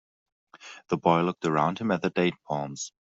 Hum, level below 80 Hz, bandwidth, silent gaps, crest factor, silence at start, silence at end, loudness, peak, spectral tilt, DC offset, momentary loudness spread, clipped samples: none; -66 dBFS; 8 kHz; none; 22 dB; 0.6 s; 0.1 s; -27 LUFS; -6 dBFS; -5.5 dB/octave; under 0.1%; 11 LU; under 0.1%